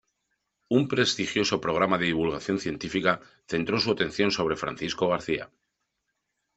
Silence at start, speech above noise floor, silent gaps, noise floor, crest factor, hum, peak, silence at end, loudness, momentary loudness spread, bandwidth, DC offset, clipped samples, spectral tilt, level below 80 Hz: 0.7 s; 54 dB; none; -80 dBFS; 24 dB; none; -4 dBFS; 1.1 s; -26 LUFS; 7 LU; 8.2 kHz; under 0.1%; under 0.1%; -4.5 dB/octave; -58 dBFS